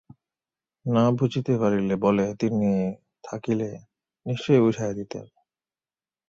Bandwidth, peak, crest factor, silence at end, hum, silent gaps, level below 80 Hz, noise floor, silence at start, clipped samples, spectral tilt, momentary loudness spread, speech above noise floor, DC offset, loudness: 7.6 kHz; -6 dBFS; 20 dB; 1.05 s; none; none; -60 dBFS; under -90 dBFS; 0.85 s; under 0.1%; -7.5 dB/octave; 17 LU; over 67 dB; under 0.1%; -24 LUFS